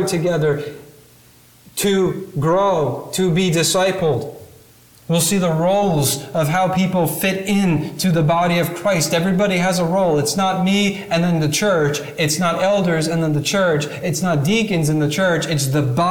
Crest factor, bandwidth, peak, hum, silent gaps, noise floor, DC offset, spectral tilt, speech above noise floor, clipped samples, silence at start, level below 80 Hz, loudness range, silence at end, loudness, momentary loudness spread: 12 dB; 19 kHz; -6 dBFS; none; none; -48 dBFS; under 0.1%; -5 dB/octave; 31 dB; under 0.1%; 0 s; -50 dBFS; 2 LU; 0 s; -18 LUFS; 5 LU